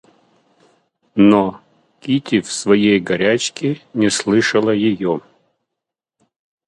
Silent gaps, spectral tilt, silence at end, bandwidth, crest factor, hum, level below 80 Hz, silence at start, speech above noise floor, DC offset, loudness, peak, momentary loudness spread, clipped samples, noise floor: none; -5 dB/octave; 1.5 s; 11 kHz; 18 dB; none; -56 dBFS; 1.15 s; 67 dB; under 0.1%; -16 LUFS; 0 dBFS; 10 LU; under 0.1%; -82 dBFS